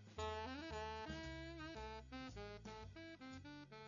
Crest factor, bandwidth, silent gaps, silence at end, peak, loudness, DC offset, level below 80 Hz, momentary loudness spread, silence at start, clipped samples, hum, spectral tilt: 18 dB; 7.2 kHz; none; 0 s; -32 dBFS; -51 LUFS; under 0.1%; -62 dBFS; 8 LU; 0 s; under 0.1%; none; -3.5 dB/octave